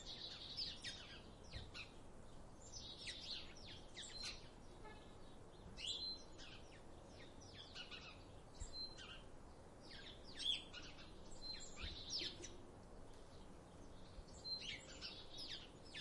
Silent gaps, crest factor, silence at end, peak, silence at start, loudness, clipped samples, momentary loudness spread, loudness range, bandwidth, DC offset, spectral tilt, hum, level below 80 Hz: none; 22 dB; 0 s; -30 dBFS; 0 s; -51 LUFS; under 0.1%; 16 LU; 6 LU; 11.5 kHz; under 0.1%; -2.5 dB/octave; none; -62 dBFS